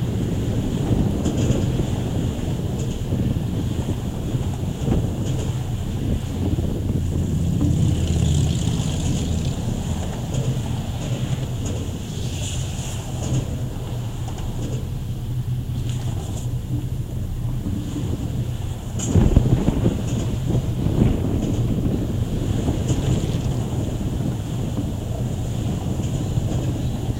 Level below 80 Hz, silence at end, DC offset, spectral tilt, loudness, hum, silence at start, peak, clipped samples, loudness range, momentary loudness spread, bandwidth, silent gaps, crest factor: -30 dBFS; 0 s; under 0.1%; -6.5 dB/octave; -24 LUFS; none; 0 s; 0 dBFS; under 0.1%; 6 LU; 7 LU; 16 kHz; none; 22 dB